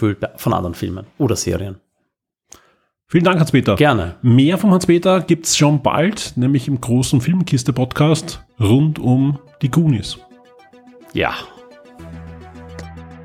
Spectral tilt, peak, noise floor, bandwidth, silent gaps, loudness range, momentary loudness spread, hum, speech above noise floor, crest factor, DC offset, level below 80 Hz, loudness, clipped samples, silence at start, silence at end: -6 dB/octave; -2 dBFS; -73 dBFS; 16 kHz; none; 8 LU; 21 LU; none; 57 dB; 16 dB; under 0.1%; -44 dBFS; -16 LUFS; under 0.1%; 0 s; 0 s